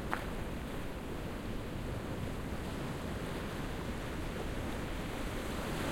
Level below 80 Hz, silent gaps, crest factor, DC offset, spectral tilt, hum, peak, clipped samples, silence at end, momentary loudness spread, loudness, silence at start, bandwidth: -44 dBFS; none; 24 dB; under 0.1%; -5.5 dB/octave; none; -14 dBFS; under 0.1%; 0 s; 3 LU; -40 LUFS; 0 s; 16.5 kHz